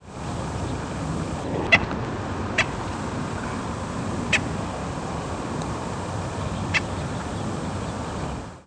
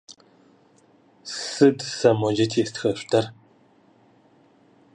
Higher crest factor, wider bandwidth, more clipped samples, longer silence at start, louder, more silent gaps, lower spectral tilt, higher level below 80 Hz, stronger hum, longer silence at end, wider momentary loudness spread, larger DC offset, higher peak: about the same, 24 dB vs 22 dB; about the same, 11 kHz vs 11 kHz; neither; about the same, 0 s vs 0.1 s; second, -27 LUFS vs -22 LUFS; neither; about the same, -5 dB/octave vs -5 dB/octave; first, -40 dBFS vs -66 dBFS; neither; second, 0 s vs 1.6 s; second, 7 LU vs 14 LU; neither; about the same, -4 dBFS vs -4 dBFS